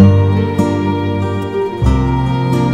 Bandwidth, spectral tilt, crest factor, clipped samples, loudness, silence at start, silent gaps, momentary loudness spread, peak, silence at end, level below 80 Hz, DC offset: 10 kHz; -8.5 dB/octave; 12 dB; 0.4%; -15 LUFS; 0 s; none; 5 LU; 0 dBFS; 0 s; -24 dBFS; under 0.1%